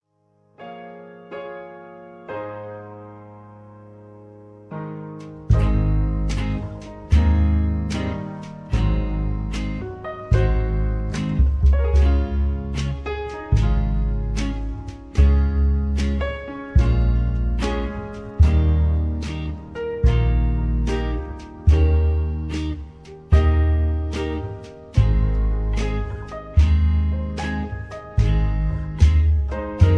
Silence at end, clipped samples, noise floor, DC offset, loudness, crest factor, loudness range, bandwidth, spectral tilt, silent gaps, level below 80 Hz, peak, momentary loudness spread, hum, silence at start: 0 s; under 0.1%; -62 dBFS; under 0.1%; -22 LUFS; 18 dB; 8 LU; 7.8 kHz; -8 dB/octave; none; -22 dBFS; -2 dBFS; 17 LU; none; 0.6 s